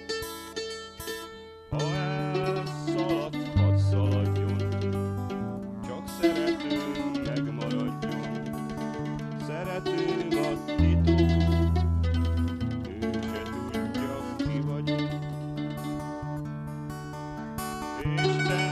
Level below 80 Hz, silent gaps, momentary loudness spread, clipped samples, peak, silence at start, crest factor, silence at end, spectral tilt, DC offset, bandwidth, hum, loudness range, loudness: -40 dBFS; none; 12 LU; under 0.1%; -10 dBFS; 0 s; 18 dB; 0 s; -6.5 dB/octave; under 0.1%; 14 kHz; none; 6 LU; -29 LUFS